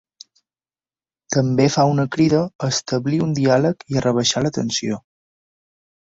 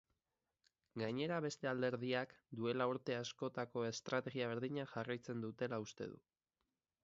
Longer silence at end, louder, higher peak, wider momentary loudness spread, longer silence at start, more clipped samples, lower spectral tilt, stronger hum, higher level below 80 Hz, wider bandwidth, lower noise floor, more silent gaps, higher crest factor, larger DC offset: first, 1.05 s vs 0.9 s; first, -19 LUFS vs -43 LUFS; first, -2 dBFS vs -24 dBFS; about the same, 6 LU vs 8 LU; first, 1.3 s vs 0.95 s; neither; about the same, -5 dB/octave vs -4.5 dB/octave; neither; first, -52 dBFS vs -82 dBFS; about the same, 8 kHz vs 7.6 kHz; about the same, under -90 dBFS vs under -90 dBFS; first, 2.55-2.59 s vs none; about the same, 18 dB vs 20 dB; neither